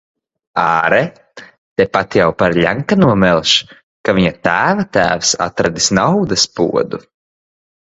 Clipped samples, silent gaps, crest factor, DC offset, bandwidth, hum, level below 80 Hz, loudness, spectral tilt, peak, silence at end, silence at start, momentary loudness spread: under 0.1%; 1.58-1.76 s, 3.83-4.04 s; 14 dB; under 0.1%; 8 kHz; none; -44 dBFS; -14 LUFS; -4 dB/octave; 0 dBFS; 0.85 s; 0.55 s; 7 LU